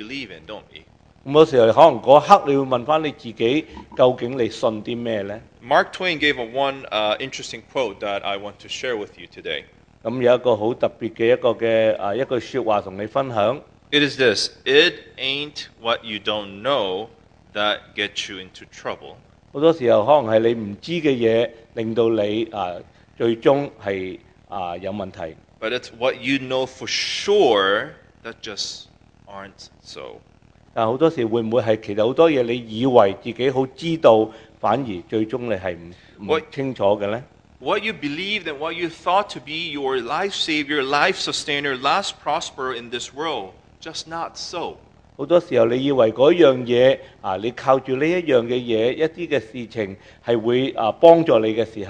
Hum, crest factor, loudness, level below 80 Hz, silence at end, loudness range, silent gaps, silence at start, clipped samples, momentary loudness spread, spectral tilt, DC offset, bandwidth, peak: none; 20 dB; -20 LUFS; -56 dBFS; 0 s; 7 LU; none; 0 s; under 0.1%; 16 LU; -5 dB/octave; under 0.1%; 9.8 kHz; 0 dBFS